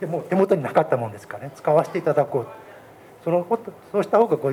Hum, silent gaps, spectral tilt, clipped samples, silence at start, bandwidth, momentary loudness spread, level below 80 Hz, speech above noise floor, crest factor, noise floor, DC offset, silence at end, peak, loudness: none; none; -8 dB/octave; under 0.1%; 0 s; 17 kHz; 14 LU; -70 dBFS; 24 dB; 18 dB; -46 dBFS; under 0.1%; 0 s; -4 dBFS; -22 LUFS